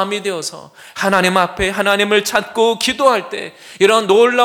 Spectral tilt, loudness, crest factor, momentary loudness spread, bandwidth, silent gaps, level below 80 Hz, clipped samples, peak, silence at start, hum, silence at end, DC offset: -3 dB/octave; -15 LUFS; 16 dB; 15 LU; 19 kHz; none; -44 dBFS; under 0.1%; 0 dBFS; 0 s; none; 0 s; under 0.1%